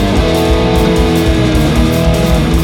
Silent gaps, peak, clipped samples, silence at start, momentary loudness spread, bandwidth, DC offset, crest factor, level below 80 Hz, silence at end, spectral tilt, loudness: none; 0 dBFS; under 0.1%; 0 s; 1 LU; 18 kHz; under 0.1%; 10 dB; -16 dBFS; 0 s; -6 dB/octave; -11 LUFS